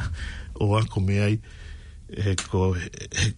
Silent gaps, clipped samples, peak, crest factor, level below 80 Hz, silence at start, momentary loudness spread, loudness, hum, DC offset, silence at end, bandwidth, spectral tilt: none; under 0.1%; -10 dBFS; 16 dB; -40 dBFS; 0 s; 20 LU; -26 LUFS; none; under 0.1%; 0 s; 11 kHz; -5.5 dB/octave